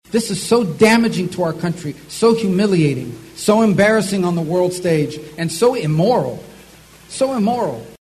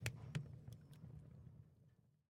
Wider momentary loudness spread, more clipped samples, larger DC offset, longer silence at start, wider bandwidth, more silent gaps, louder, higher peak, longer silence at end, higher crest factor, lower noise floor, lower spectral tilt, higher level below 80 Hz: second, 12 LU vs 15 LU; neither; neither; about the same, 0.1 s vs 0 s; second, 13.5 kHz vs 16.5 kHz; neither; first, -17 LUFS vs -54 LUFS; first, -2 dBFS vs -24 dBFS; about the same, 0.1 s vs 0.2 s; second, 16 dB vs 28 dB; second, -43 dBFS vs -73 dBFS; about the same, -5.5 dB/octave vs -5 dB/octave; first, -52 dBFS vs -72 dBFS